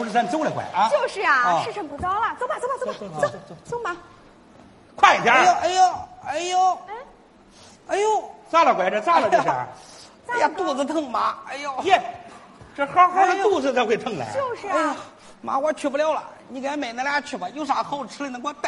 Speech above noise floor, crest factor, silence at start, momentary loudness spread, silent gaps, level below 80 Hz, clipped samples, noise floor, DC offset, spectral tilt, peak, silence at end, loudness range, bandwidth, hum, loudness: 28 dB; 22 dB; 0 s; 14 LU; none; -60 dBFS; under 0.1%; -50 dBFS; under 0.1%; -3.5 dB/octave; 0 dBFS; 0 s; 6 LU; 11.5 kHz; none; -22 LUFS